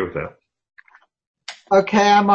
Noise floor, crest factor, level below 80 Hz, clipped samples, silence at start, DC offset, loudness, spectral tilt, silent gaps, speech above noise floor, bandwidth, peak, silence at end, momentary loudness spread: -52 dBFS; 16 dB; -54 dBFS; under 0.1%; 0 s; under 0.1%; -17 LUFS; -5 dB/octave; 1.27-1.34 s; 36 dB; 8.6 kHz; -2 dBFS; 0 s; 23 LU